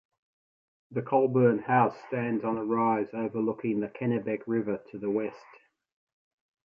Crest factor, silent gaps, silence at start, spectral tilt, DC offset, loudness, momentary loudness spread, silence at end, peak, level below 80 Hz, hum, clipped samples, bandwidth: 20 dB; none; 0.9 s; -10.5 dB/octave; under 0.1%; -29 LUFS; 10 LU; 1.3 s; -10 dBFS; -72 dBFS; none; under 0.1%; 5.6 kHz